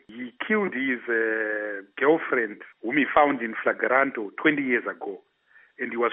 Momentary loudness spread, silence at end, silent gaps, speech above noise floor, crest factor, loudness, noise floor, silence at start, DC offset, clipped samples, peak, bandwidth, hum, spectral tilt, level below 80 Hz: 13 LU; 0 s; none; 34 dB; 22 dB; -25 LUFS; -59 dBFS; 0.1 s; under 0.1%; under 0.1%; -4 dBFS; 3.9 kHz; none; -3 dB/octave; -68 dBFS